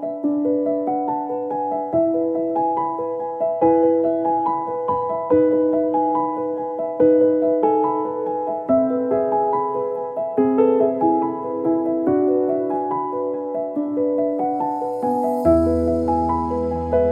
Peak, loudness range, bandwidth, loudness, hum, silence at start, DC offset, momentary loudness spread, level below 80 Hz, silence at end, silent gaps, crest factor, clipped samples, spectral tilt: -4 dBFS; 2 LU; 5.2 kHz; -20 LUFS; none; 0 s; under 0.1%; 8 LU; -44 dBFS; 0 s; none; 16 dB; under 0.1%; -10 dB/octave